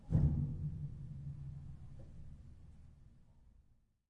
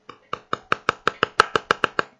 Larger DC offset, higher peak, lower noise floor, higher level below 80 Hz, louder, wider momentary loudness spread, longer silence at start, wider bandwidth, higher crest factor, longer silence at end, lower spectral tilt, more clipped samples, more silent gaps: neither; second, -20 dBFS vs 0 dBFS; first, -70 dBFS vs -37 dBFS; first, -50 dBFS vs -56 dBFS; second, -41 LUFS vs -22 LUFS; first, 25 LU vs 12 LU; second, 0 s vs 0.35 s; second, 2.4 kHz vs 11 kHz; about the same, 22 dB vs 24 dB; first, 0.5 s vs 0.15 s; first, -11 dB/octave vs -3 dB/octave; neither; neither